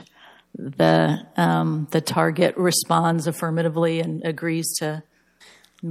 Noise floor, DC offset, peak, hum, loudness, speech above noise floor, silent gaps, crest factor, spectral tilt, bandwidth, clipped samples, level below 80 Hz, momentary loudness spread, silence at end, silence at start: -53 dBFS; under 0.1%; -4 dBFS; none; -21 LUFS; 32 dB; none; 18 dB; -5 dB/octave; 15.5 kHz; under 0.1%; -70 dBFS; 12 LU; 0 s; 0 s